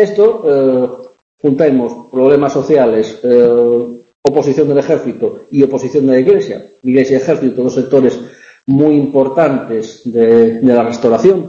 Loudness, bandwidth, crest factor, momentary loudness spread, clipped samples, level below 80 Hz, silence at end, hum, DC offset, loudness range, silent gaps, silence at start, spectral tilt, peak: -12 LUFS; 7.4 kHz; 12 dB; 9 LU; under 0.1%; -54 dBFS; 0 s; none; under 0.1%; 1 LU; 1.22-1.38 s, 4.15-4.23 s; 0 s; -7.5 dB/octave; 0 dBFS